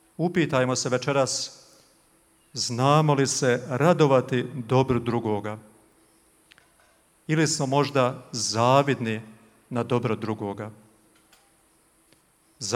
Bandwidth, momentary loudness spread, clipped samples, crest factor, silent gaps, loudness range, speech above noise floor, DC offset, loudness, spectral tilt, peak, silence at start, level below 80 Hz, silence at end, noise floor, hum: 15 kHz; 14 LU; under 0.1%; 22 dB; none; 7 LU; 39 dB; under 0.1%; -24 LUFS; -5 dB/octave; -4 dBFS; 0.2 s; -62 dBFS; 0 s; -62 dBFS; none